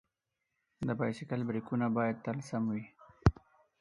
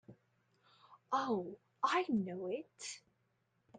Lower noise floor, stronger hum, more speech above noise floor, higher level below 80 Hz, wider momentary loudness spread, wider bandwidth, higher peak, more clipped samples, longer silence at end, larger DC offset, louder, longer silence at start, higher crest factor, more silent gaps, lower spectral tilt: first, -86 dBFS vs -80 dBFS; neither; first, 52 dB vs 41 dB; first, -48 dBFS vs -84 dBFS; second, 7 LU vs 13 LU; first, 11 kHz vs 9.6 kHz; first, -8 dBFS vs -20 dBFS; neither; first, 0.5 s vs 0 s; neither; first, -35 LUFS vs -38 LUFS; first, 0.8 s vs 0.1 s; first, 28 dB vs 20 dB; neither; first, -8 dB/octave vs -4.5 dB/octave